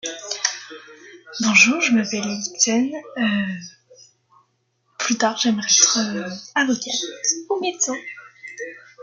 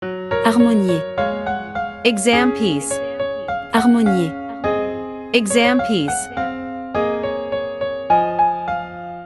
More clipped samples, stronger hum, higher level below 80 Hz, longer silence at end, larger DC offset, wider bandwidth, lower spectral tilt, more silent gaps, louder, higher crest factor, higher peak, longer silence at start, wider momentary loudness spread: neither; neither; second, -68 dBFS vs -50 dBFS; about the same, 0 s vs 0 s; neither; second, 10.5 kHz vs 12 kHz; second, -1.5 dB/octave vs -4.5 dB/octave; neither; about the same, -19 LUFS vs -19 LUFS; about the same, 22 dB vs 18 dB; about the same, 0 dBFS vs 0 dBFS; about the same, 0.05 s vs 0 s; first, 21 LU vs 10 LU